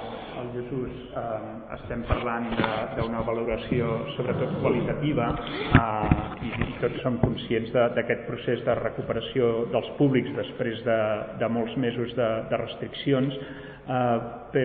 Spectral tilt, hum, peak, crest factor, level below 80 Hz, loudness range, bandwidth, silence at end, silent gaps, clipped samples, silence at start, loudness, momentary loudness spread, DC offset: -5.5 dB/octave; none; -4 dBFS; 22 dB; -42 dBFS; 3 LU; 4.7 kHz; 0 s; none; under 0.1%; 0 s; -27 LUFS; 10 LU; under 0.1%